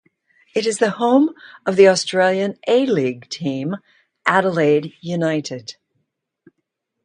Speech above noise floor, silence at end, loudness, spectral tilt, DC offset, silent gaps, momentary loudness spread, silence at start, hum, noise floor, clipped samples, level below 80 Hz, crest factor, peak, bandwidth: 58 dB; 1.3 s; -18 LUFS; -5 dB/octave; under 0.1%; none; 13 LU; 0.55 s; none; -76 dBFS; under 0.1%; -68 dBFS; 20 dB; 0 dBFS; 10.5 kHz